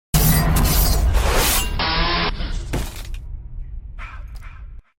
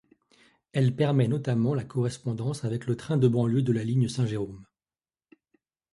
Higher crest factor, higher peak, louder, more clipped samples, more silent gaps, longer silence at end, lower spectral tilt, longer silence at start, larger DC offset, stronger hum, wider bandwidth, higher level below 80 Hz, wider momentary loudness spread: about the same, 16 dB vs 18 dB; first, -4 dBFS vs -10 dBFS; first, -19 LUFS vs -27 LUFS; neither; neither; second, 0.2 s vs 1.3 s; second, -3.5 dB/octave vs -7.5 dB/octave; second, 0.15 s vs 0.75 s; neither; neither; first, 17 kHz vs 11.5 kHz; first, -22 dBFS vs -60 dBFS; first, 20 LU vs 8 LU